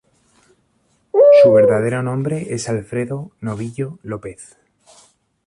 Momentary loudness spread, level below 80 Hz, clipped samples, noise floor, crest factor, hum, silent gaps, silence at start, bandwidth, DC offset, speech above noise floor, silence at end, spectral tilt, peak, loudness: 20 LU; -56 dBFS; under 0.1%; -62 dBFS; 16 dB; none; none; 1.15 s; 11.5 kHz; under 0.1%; 43 dB; 1 s; -6.5 dB/octave; -2 dBFS; -16 LUFS